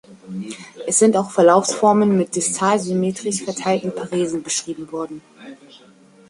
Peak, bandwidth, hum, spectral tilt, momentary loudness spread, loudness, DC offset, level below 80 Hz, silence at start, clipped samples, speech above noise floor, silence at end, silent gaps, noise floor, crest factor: -2 dBFS; 11.5 kHz; none; -4.5 dB/octave; 16 LU; -18 LUFS; under 0.1%; -64 dBFS; 0.1 s; under 0.1%; 30 dB; 0.55 s; none; -49 dBFS; 18 dB